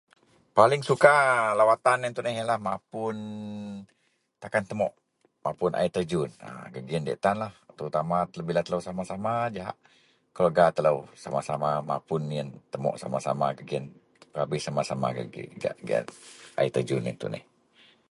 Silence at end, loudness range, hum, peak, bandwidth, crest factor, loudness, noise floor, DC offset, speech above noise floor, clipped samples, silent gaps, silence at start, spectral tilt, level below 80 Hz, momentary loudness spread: 0.7 s; 7 LU; none; -2 dBFS; 11.5 kHz; 26 dB; -27 LUFS; -60 dBFS; under 0.1%; 33 dB; under 0.1%; none; 0.55 s; -5.5 dB/octave; -64 dBFS; 16 LU